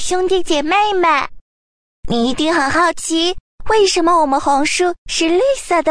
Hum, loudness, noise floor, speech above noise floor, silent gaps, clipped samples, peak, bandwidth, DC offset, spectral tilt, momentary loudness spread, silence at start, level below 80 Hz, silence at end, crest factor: none; -15 LUFS; under -90 dBFS; over 75 dB; 1.41-2.03 s, 3.40-3.58 s, 4.98-5.06 s; under 0.1%; -4 dBFS; 11 kHz; under 0.1%; -2.5 dB/octave; 5 LU; 0 s; -38 dBFS; 0 s; 12 dB